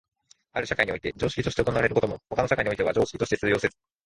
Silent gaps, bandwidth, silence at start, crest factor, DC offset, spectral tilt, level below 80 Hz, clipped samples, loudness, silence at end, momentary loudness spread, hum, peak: none; 11.5 kHz; 0.55 s; 22 dB; under 0.1%; -5.5 dB/octave; -48 dBFS; under 0.1%; -26 LUFS; 0.35 s; 5 LU; none; -6 dBFS